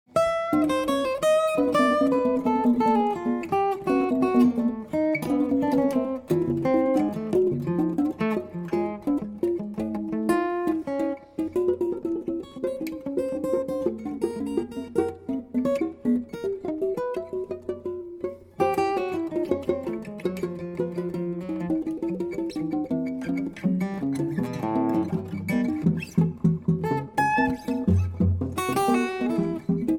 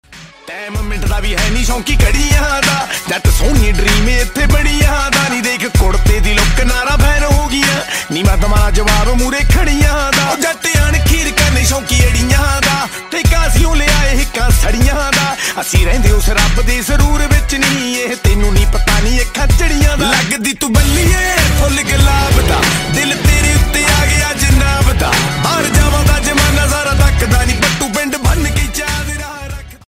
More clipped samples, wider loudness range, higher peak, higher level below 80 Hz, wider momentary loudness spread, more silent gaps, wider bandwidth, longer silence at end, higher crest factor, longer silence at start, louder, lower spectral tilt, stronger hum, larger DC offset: neither; first, 6 LU vs 2 LU; second, -8 dBFS vs 0 dBFS; second, -52 dBFS vs -14 dBFS; first, 8 LU vs 4 LU; neither; about the same, 17 kHz vs 16.5 kHz; second, 0 s vs 0.15 s; first, 16 dB vs 10 dB; about the same, 0.15 s vs 0.1 s; second, -26 LUFS vs -12 LUFS; first, -7.5 dB/octave vs -4 dB/octave; neither; neither